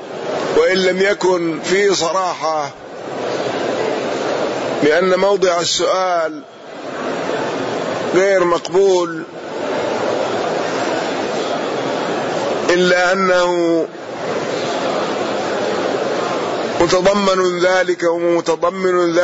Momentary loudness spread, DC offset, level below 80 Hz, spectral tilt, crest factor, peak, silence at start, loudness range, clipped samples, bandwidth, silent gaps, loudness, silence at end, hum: 9 LU; under 0.1%; -54 dBFS; -4 dB/octave; 12 dB; -4 dBFS; 0 s; 3 LU; under 0.1%; 8 kHz; none; -17 LUFS; 0 s; none